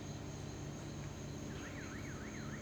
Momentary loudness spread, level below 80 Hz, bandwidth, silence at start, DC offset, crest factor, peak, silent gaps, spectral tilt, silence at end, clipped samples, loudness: 1 LU; -58 dBFS; over 20 kHz; 0 s; under 0.1%; 14 dB; -32 dBFS; none; -5 dB/octave; 0 s; under 0.1%; -46 LUFS